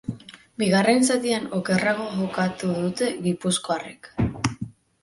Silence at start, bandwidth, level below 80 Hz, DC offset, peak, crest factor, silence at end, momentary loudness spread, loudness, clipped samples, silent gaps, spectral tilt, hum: 0.1 s; 11.5 kHz; -50 dBFS; under 0.1%; -4 dBFS; 20 dB; 0.3 s; 16 LU; -24 LUFS; under 0.1%; none; -4.5 dB/octave; none